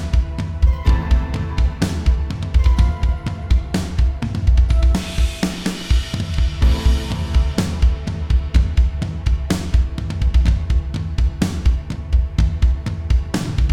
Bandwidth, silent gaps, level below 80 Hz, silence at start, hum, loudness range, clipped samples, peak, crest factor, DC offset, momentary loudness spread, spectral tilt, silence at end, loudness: 11.5 kHz; none; -18 dBFS; 0 s; none; 1 LU; under 0.1%; -2 dBFS; 14 dB; under 0.1%; 5 LU; -6.5 dB/octave; 0 s; -20 LUFS